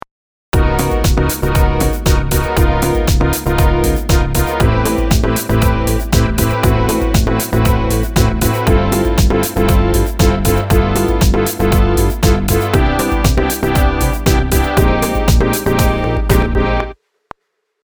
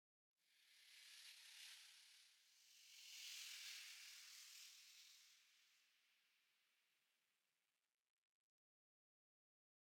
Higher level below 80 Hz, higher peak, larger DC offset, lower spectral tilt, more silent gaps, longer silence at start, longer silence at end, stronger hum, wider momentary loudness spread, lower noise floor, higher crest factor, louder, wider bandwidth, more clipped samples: first, -16 dBFS vs under -90 dBFS; first, 0 dBFS vs -44 dBFS; neither; first, -5.5 dB/octave vs 6 dB/octave; neither; first, 0.55 s vs 0.4 s; second, 0.95 s vs 2.85 s; neither; second, 2 LU vs 14 LU; second, -66 dBFS vs under -90 dBFS; second, 12 dB vs 22 dB; first, -14 LUFS vs -59 LUFS; first, over 20 kHz vs 17.5 kHz; neither